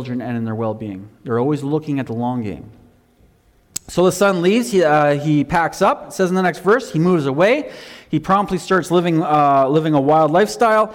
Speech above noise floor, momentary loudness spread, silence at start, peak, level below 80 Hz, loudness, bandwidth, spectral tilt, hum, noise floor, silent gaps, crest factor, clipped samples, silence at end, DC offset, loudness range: 37 dB; 11 LU; 0 s; -6 dBFS; -50 dBFS; -17 LUFS; 18 kHz; -6 dB/octave; none; -54 dBFS; none; 12 dB; under 0.1%; 0 s; under 0.1%; 7 LU